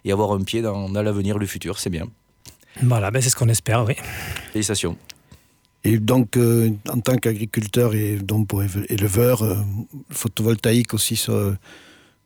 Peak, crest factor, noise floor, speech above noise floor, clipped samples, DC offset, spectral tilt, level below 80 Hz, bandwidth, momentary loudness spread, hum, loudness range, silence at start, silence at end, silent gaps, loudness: -6 dBFS; 16 dB; -56 dBFS; 35 dB; under 0.1%; under 0.1%; -5.5 dB/octave; -48 dBFS; over 20 kHz; 10 LU; none; 2 LU; 0.05 s; 0.5 s; none; -21 LUFS